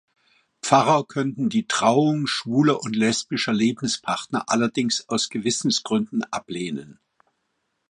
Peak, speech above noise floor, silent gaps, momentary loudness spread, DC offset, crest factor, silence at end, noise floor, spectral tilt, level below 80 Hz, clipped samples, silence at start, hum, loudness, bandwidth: -2 dBFS; 52 dB; none; 10 LU; under 0.1%; 22 dB; 1 s; -74 dBFS; -4 dB/octave; -66 dBFS; under 0.1%; 0.65 s; none; -22 LUFS; 11.5 kHz